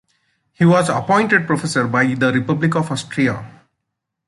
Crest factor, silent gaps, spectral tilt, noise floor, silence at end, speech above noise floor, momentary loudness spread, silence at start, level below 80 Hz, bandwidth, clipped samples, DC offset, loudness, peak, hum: 16 dB; none; -6 dB/octave; -78 dBFS; 0.8 s; 61 dB; 6 LU; 0.6 s; -56 dBFS; 11.5 kHz; under 0.1%; under 0.1%; -17 LUFS; -2 dBFS; none